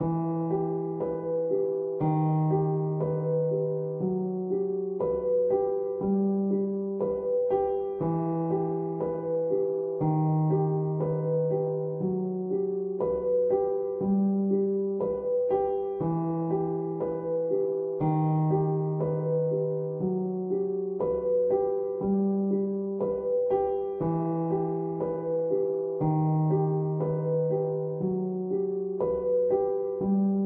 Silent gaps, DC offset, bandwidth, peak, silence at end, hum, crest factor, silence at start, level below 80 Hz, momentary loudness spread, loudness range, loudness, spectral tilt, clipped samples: none; under 0.1%; 2.7 kHz; -14 dBFS; 0 s; none; 12 dB; 0 s; -60 dBFS; 5 LU; 1 LU; -28 LUFS; -14 dB/octave; under 0.1%